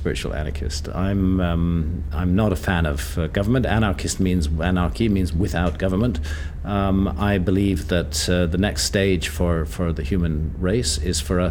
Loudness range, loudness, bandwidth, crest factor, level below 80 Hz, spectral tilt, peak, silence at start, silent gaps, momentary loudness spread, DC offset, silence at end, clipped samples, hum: 1 LU; -22 LUFS; 18.5 kHz; 16 dB; -28 dBFS; -5.5 dB/octave; -4 dBFS; 0 s; none; 5 LU; under 0.1%; 0 s; under 0.1%; none